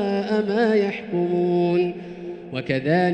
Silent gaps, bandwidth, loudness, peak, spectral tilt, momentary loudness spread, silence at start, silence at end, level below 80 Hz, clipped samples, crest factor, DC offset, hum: none; 8.6 kHz; -22 LUFS; -8 dBFS; -8 dB/octave; 12 LU; 0 s; 0 s; -60 dBFS; under 0.1%; 14 dB; under 0.1%; none